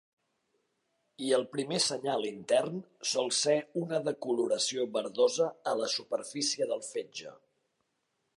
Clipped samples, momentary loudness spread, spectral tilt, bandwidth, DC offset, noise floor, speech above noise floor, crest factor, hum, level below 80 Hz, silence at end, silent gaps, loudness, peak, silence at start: under 0.1%; 10 LU; -3 dB/octave; 11.5 kHz; under 0.1%; -80 dBFS; 49 dB; 18 dB; none; -84 dBFS; 1 s; none; -31 LUFS; -14 dBFS; 1.2 s